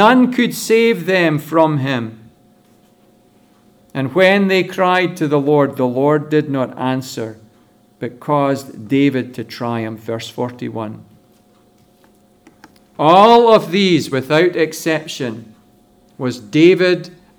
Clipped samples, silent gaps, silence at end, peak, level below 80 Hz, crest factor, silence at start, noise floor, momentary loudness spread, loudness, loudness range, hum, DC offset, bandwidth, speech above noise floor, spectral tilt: under 0.1%; none; 0.3 s; 0 dBFS; -62 dBFS; 16 dB; 0 s; -52 dBFS; 15 LU; -15 LUFS; 8 LU; none; under 0.1%; over 20 kHz; 37 dB; -5.5 dB/octave